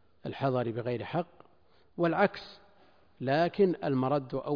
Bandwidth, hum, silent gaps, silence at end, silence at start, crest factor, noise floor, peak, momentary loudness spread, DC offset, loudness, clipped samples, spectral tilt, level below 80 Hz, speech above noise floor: 5.2 kHz; none; none; 0 s; 0.25 s; 20 dB; -66 dBFS; -12 dBFS; 16 LU; under 0.1%; -30 LUFS; under 0.1%; -9 dB/octave; -66 dBFS; 37 dB